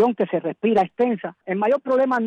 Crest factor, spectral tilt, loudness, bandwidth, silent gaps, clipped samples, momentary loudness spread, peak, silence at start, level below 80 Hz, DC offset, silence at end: 12 dB; -8 dB/octave; -22 LUFS; 8.2 kHz; none; under 0.1%; 5 LU; -10 dBFS; 0 s; -66 dBFS; under 0.1%; 0 s